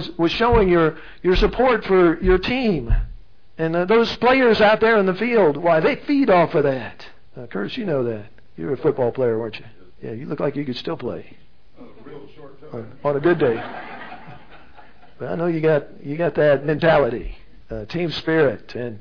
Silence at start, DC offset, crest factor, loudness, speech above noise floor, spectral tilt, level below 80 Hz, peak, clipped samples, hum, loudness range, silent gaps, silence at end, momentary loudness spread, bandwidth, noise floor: 0 s; 1%; 16 dB; -19 LUFS; 29 dB; -7.5 dB/octave; -34 dBFS; -4 dBFS; under 0.1%; none; 9 LU; none; 0 s; 19 LU; 5.4 kHz; -49 dBFS